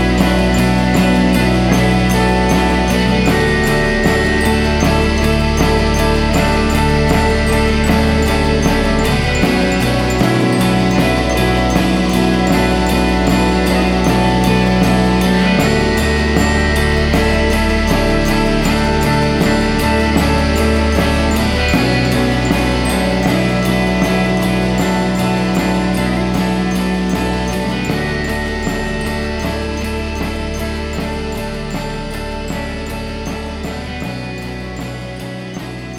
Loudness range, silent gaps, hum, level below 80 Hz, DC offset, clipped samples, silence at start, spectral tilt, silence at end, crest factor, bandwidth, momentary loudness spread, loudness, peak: 9 LU; none; none; -22 dBFS; under 0.1%; under 0.1%; 0 s; -5.5 dB/octave; 0 s; 14 dB; 16.5 kHz; 10 LU; -14 LUFS; 0 dBFS